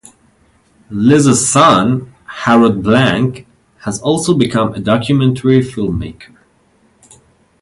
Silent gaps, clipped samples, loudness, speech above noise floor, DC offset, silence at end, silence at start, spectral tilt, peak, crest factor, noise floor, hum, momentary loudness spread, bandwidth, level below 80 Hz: none; under 0.1%; -12 LUFS; 42 dB; under 0.1%; 1.4 s; 0.9 s; -5 dB/octave; 0 dBFS; 14 dB; -53 dBFS; none; 14 LU; 11.5 kHz; -40 dBFS